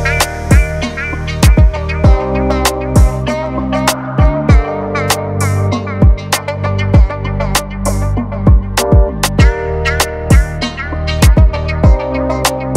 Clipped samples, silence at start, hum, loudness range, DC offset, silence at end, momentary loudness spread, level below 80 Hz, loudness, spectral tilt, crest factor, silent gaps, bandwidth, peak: under 0.1%; 0 s; none; 1 LU; under 0.1%; 0 s; 7 LU; -14 dBFS; -13 LUFS; -5.5 dB/octave; 12 dB; none; 16 kHz; 0 dBFS